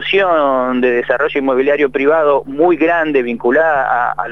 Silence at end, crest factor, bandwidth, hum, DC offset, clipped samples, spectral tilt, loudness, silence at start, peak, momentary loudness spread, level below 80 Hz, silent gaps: 0 s; 12 dB; 6.6 kHz; none; 1%; under 0.1%; -6.5 dB/octave; -13 LUFS; 0 s; 0 dBFS; 3 LU; -48 dBFS; none